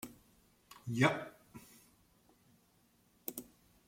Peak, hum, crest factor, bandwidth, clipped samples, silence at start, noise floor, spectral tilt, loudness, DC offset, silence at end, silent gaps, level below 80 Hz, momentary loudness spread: -16 dBFS; none; 26 dB; 16.5 kHz; under 0.1%; 0.05 s; -71 dBFS; -5.5 dB/octave; -37 LUFS; under 0.1%; 0.45 s; none; -76 dBFS; 26 LU